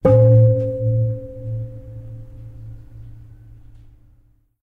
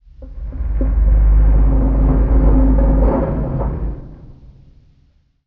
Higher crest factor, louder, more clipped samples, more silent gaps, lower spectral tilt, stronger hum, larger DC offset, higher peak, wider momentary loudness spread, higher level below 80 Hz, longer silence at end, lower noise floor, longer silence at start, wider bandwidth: about the same, 16 dB vs 14 dB; about the same, -17 LUFS vs -16 LUFS; neither; neither; about the same, -12 dB/octave vs -11.5 dB/octave; neither; neither; about the same, -2 dBFS vs -2 dBFS; first, 27 LU vs 14 LU; second, -42 dBFS vs -16 dBFS; first, 1.5 s vs 1.15 s; about the same, -55 dBFS vs -55 dBFS; second, 0.05 s vs 0.2 s; about the same, 2.4 kHz vs 2.4 kHz